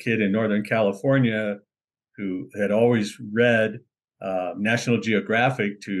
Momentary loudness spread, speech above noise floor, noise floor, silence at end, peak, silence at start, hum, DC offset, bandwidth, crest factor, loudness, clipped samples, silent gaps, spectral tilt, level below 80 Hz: 11 LU; 49 dB; -71 dBFS; 0 s; -8 dBFS; 0 s; none; under 0.1%; 12.5 kHz; 16 dB; -23 LUFS; under 0.1%; 1.84-1.88 s; -6.5 dB/octave; -72 dBFS